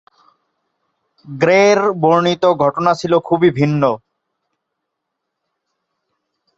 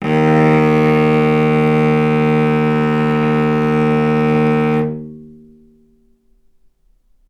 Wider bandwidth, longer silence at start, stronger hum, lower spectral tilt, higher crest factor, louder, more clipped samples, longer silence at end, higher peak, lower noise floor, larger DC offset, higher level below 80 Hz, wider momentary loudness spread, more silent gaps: about the same, 8 kHz vs 8.6 kHz; first, 1.25 s vs 0 s; neither; second, -6 dB/octave vs -8.5 dB/octave; about the same, 16 dB vs 14 dB; about the same, -14 LUFS vs -14 LUFS; neither; first, 2.6 s vs 2 s; about the same, -2 dBFS vs 0 dBFS; first, -77 dBFS vs -55 dBFS; neither; second, -58 dBFS vs -46 dBFS; first, 7 LU vs 3 LU; neither